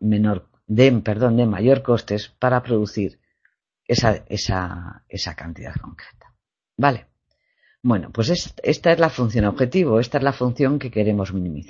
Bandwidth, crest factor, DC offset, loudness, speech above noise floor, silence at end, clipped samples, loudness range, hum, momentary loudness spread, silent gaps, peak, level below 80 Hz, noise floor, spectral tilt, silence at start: 7.6 kHz; 20 dB; under 0.1%; -20 LUFS; 50 dB; 0.05 s; under 0.1%; 7 LU; none; 14 LU; none; 0 dBFS; -44 dBFS; -70 dBFS; -6.5 dB/octave; 0 s